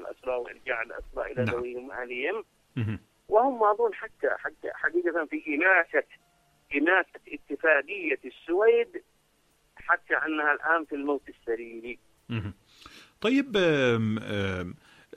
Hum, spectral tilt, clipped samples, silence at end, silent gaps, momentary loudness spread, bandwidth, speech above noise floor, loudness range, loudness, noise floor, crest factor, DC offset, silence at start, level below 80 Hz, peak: none; -6.5 dB/octave; under 0.1%; 0.45 s; none; 14 LU; 11 kHz; 40 dB; 4 LU; -27 LUFS; -67 dBFS; 20 dB; under 0.1%; 0 s; -60 dBFS; -8 dBFS